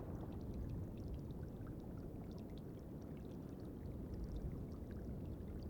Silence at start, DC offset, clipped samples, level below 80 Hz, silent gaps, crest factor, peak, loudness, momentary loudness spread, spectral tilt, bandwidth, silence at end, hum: 0 s; under 0.1%; under 0.1%; -54 dBFS; none; 12 dB; -36 dBFS; -50 LUFS; 3 LU; -9 dB/octave; 19 kHz; 0 s; none